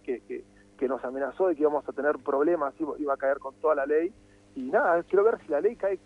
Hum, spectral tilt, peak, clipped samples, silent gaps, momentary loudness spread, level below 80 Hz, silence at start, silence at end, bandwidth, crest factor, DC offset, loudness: 50 Hz at -65 dBFS; -7.5 dB/octave; -12 dBFS; under 0.1%; none; 11 LU; -64 dBFS; 0.05 s; 0.1 s; 8.4 kHz; 16 dB; under 0.1%; -27 LUFS